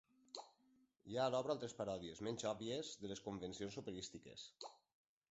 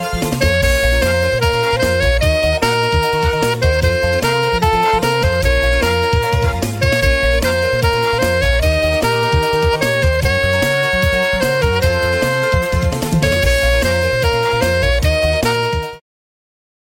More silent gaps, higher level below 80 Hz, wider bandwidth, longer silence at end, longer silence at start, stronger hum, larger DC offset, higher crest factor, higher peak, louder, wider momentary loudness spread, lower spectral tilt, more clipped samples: neither; second, -76 dBFS vs -22 dBFS; second, 8 kHz vs 16.5 kHz; second, 0.55 s vs 1 s; first, 0.35 s vs 0 s; neither; neither; first, 20 dB vs 14 dB; second, -26 dBFS vs 0 dBFS; second, -46 LUFS vs -15 LUFS; first, 15 LU vs 2 LU; about the same, -4.5 dB/octave vs -4.5 dB/octave; neither